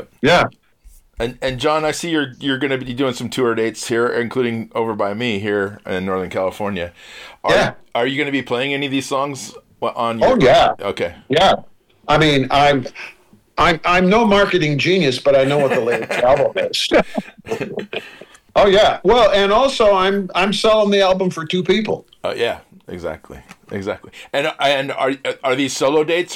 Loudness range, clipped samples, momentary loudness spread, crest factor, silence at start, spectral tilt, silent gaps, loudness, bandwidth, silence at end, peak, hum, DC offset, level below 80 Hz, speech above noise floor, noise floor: 6 LU; under 0.1%; 14 LU; 12 dB; 0 s; -4.5 dB/octave; none; -17 LUFS; 16 kHz; 0 s; -6 dBFS; none; under 0.1%; -42 dBFS; 30 dB; -47 dBFS